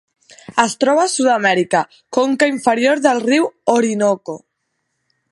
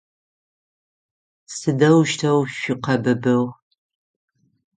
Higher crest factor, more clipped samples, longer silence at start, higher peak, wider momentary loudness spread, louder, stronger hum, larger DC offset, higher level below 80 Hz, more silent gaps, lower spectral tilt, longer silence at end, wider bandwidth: about the same, 16 dB vs 18 dB; neither; second, 0.5 s vs 1.5 s; first, 0 dBFS vs -4 dBFS; second, 7 LU vs 11 LU; first, -16 LUFS vs -19 LUFS; neither; neither; about the same, -66 dBFS vs -62 dBFS; neither; second, -3.5 dB/octave vs -6 dB/octave; second, 0.95 s vs 1.25 s; first, 11.5 kHz vs 9.6 kHz